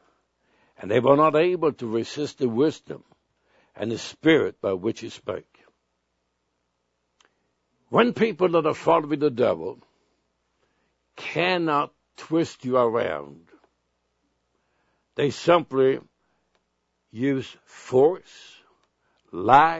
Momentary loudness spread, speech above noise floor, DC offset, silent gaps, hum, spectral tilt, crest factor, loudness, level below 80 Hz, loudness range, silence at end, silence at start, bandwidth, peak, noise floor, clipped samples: 17 LU; 53 dB; under 0.1%; none; none; -6 dB/octave; 24 dB; -23 LUFS; -68 dBFS; 5 LU; 0 s; 0.8 s; 8 kHz; 0 dBFS; -75 dBFS; under 0.1%